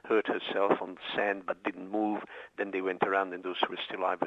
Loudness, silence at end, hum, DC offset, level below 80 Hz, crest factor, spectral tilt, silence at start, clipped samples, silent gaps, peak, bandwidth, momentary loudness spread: -32 LUFS; 0 s; none; under 0.1%; -78 dBFS; 22 dB; -6 dB/octave; 0.05 s; under 0.1%; none; -10 dBFS; 7.8 kHz; 7 LU